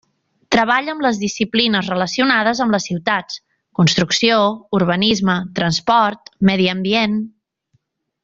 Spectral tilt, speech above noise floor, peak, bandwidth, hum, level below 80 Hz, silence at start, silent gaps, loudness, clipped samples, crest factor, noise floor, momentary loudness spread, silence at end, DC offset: -4.5 dB/octave; 48 dB; -2 dBFS; 7.8 kHz; none; -52 dBFS; 0.5 s; none; -17 LUFS; under 0.1%; 16 dB; -65 dBFS; 6 LU; 0.95 s; under 0.1%